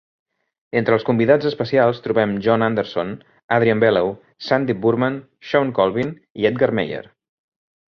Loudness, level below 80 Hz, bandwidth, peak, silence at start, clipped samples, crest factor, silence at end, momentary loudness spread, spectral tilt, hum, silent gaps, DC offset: -19 LUFS; -56 dBFS; 6.4 kHz; -2 dBFS; 0.75 s; under 0.1%; 18 dB; 0.95 s; 10 LU; -8 dB/octave; none; 3.44-3.49 s, 6.30-6.35 s; under 0.1%